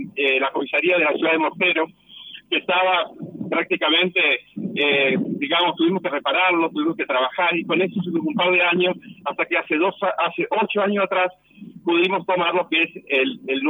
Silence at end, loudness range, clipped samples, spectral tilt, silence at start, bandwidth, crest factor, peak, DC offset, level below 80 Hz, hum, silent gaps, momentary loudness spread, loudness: 0 s; 2 LU; under 0.1%; -7 dB/octave; 0 s; 19.5 kHz; 12 dB; -8 dBFS; under 0.1%; -74 dBFS; none; none; 7 LU; -20 LUFS